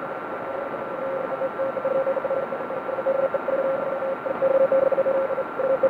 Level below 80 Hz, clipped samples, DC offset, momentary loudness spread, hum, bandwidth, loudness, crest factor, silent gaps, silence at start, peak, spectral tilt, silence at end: -66 dBFS; under 0.1%; under 0.1%; 10 LU; none; 4.5 kHz; -25 LUFS; 14 dB; none; 0 s; -10 dBFS; -7.5 dB/octave; 0 s